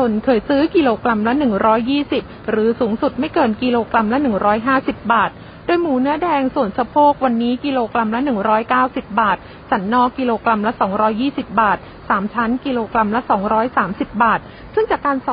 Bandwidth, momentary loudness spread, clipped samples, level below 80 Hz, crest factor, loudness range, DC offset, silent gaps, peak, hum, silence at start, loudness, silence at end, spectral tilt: 5.2 kHz; 5 LU; under 0.1%; -44 dBFS; 16 dB; 1 LU; under 0.1%; none; -2 dBFS; none; 0 s; -17 LUFS; 0 s; -11 dB/octave